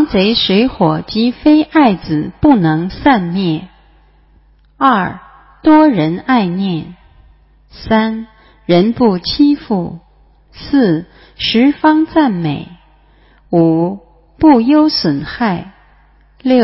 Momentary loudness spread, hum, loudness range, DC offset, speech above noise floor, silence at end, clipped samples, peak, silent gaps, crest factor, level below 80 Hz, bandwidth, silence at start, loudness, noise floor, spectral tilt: 12 LU; none; 3 LU; under 0.1%; 36 dB; 0 s; under 0.1%; 0 dBFS; none; 14 dB; -40 dBFS; 5.8 kHz; 0 s; -13 LUFS; -48 dBFS; -9.5 dB/octave